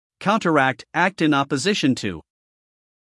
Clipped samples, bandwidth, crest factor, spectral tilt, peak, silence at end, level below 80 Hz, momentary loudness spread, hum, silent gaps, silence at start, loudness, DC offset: under 0.1%; 12 kHz; 18 dB; -5 dB/octave; -4 dBFS; 0.8 s; -62 dBFS; 7 LU; none; none; 0.2 s; -20 LUFS; under 0.1%